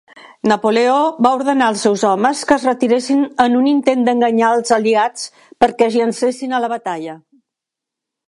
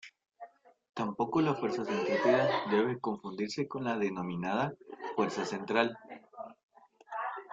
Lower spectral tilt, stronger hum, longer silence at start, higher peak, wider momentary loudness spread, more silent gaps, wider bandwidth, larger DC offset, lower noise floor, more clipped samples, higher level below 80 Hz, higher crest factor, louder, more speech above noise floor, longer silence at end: second, -4 dB/octave vs -6 dB/octave; neither; first, 0.45 s vs 0.05 s; first, 0 dBFS vs -12 dBFS; second, 7 LU vs 20 LU; second, none vs 0.89-0.93 s, 6.63-6.69 s; first, 11.5 kHz vs 7.8 kHz; neither; first, -83 dBFS vs -54 dBFS; neither; first, -58 dBFS vs -72 dBFS; second, 16 dB vs 22 dB; first, -15 LUFS vs -32 LUFS; first, 69 dB vs 22 dB; first, 1.1 s vs 0 s